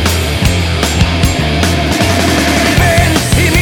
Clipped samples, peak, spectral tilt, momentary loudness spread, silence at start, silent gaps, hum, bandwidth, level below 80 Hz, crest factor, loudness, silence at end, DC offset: under 0.1%; 0 dBFS; -4.5 dB/octave; 3 LU; 0 s; none; none; 19.5 kHz; -20 dBFS; 10 dB; -11 LUFS; 0 s; under 0.1%